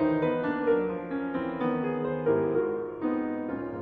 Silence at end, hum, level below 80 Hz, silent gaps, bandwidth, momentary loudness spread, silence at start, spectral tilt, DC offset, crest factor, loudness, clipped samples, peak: 0 s; none; -60 dBFS; none; 4.8 kHz; 6 LU; 0 s; -10 dB/octave; under 0.1%; 14 dB; -29 LUFS; under 0.1%; -14 dBFS